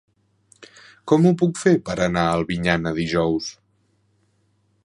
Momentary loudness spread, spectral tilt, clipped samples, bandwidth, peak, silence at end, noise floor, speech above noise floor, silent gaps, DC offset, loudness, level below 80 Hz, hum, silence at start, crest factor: 7 LU; -6 dB/octave; under 0.1%; 11 kHz; -2 dBFS; 1.3 s; -65 dBFS; 45 dB; none; under 0.1%; -20 LUFS; -48 dBFS; none; 0.6 s; 20 dB